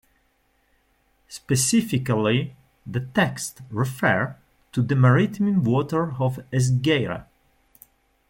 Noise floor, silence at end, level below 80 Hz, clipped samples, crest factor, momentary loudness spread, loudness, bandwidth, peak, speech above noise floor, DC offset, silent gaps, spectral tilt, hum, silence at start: -66 dBFS; 1.05 s; -56 dBFS; under 0.1%; 18 dB; 12 LU; -23 LUFS; 16.5 kHz; -6 dBFS; 44 dB; under 0.1%; none; -5.5 dB/octave; none; 1.3 s